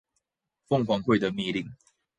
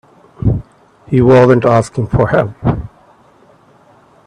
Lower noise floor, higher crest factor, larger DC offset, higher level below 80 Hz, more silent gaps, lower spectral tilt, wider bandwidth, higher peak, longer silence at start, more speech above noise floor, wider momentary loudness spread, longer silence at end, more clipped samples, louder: first, -81 dBFS vs -47 dBFS; first, 20 dB vs 14 dB; neither; second, -62 dBFS vs -34 dBFS; neither; second, -7 dB/octave vs -8.5 dB/octave; about the same, 9.6 kHz vs 10 kHz; second, -10 dBFS vs 0 dBFS; first, 0.7 s vs 0.45 s; first, 55 dB vs 36 dB; second, 9 LU vs 13 LU; second, 0.45 s vs 1.4 s; neither; second, -27 LUFS vs -12 LUFS